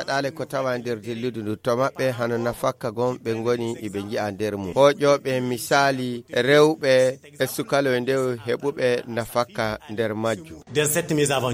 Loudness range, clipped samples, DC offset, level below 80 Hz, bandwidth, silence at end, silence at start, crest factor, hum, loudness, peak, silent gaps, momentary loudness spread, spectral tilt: 5 LU; under 0.1%; under 0.1%; -58 dBFS; 16.5 kHz; 0 s; 0 s; 20 dB; none; -23 LUFS; -4 dBFS; none; 10 LU; -4.5 dB/octave